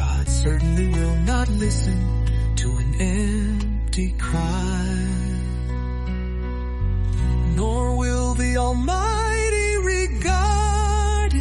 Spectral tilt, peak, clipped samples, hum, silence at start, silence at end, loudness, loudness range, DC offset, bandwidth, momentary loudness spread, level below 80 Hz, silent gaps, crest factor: -5.5 dB/octave; -8 dBFS; under 0.1%; none; 0 s; 0 s; -22 LUFS; 4 LU; under 0.1%; 11.5 kHz; 6 LU; -22 dBFS; none; 12 dB